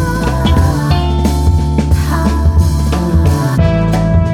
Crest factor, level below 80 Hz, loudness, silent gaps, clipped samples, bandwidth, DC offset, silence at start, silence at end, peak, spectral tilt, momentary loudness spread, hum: 10 dB; -16 dBFS; -13 LUFS; none; under 0.1%; 15 kHz; under 0.1%; 0 s; 0 s; 0 dBFS; -7 dB/octave; 2 LU; none